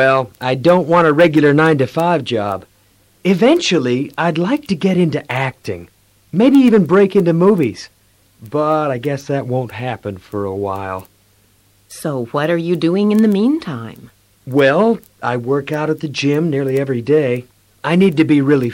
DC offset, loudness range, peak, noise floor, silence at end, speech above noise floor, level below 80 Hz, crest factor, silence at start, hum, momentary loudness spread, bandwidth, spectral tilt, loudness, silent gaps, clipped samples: under 0.1%; 7 LU; -2 dBFS; -54 dBFS; 0 s; 39 dB; -56 dBFS; 12 dB; 0 s; none; 13 LU; 16.5 kHz; -7 dB/octave; -15 LUFS; none; under 0.1%